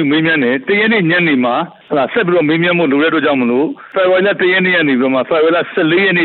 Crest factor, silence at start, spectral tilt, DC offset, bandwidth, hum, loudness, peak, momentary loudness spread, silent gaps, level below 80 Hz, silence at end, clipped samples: 10 dB; 0 s; -10 dB/octave; under 0.1%; 4.4 kHz; none; -12 LUFS; -4 dBFS; 5 LU; none; -58 dBFS; 0 s; under 0.1%